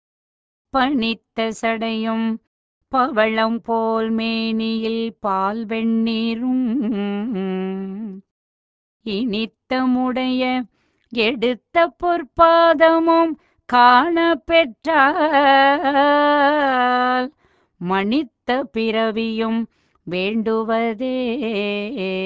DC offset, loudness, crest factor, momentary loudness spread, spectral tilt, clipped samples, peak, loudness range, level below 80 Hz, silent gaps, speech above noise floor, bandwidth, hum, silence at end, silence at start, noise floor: under 0.1%; -19 LUFS; 18 dB; 11 LU; -6 dB/octave; under 0.1%; 0 dBFS; 8 LU; -54 dBFS; 2.47-2.81 s, 8.31-9.00 s; over 72 dB; 7.8 kHz; none; 0 s; 0.75 s; under -90 dBFS